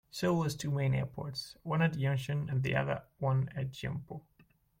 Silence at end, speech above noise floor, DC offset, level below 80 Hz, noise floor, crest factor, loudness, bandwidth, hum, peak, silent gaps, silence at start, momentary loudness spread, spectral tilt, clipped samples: 0.6 s; 34 dB; under 0.1%; -60 dBFS; -67 dBFS; 16 dB; -34 LUFS; 16 kHz; none; -16 dBFS; none; 0.15 s; 9 LU; -6.5 dB/octave; under 0.1%